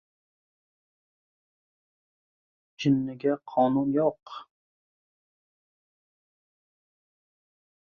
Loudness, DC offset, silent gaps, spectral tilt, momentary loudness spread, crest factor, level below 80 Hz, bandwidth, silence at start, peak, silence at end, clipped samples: -26 LUFS; under 0.1%; none; -7.5 dB/octave; 19 LU; 22 dB; -70 dBFS; 7 kHz; 2.8 s; -10 dBFS; 3.5 s; under 0.1%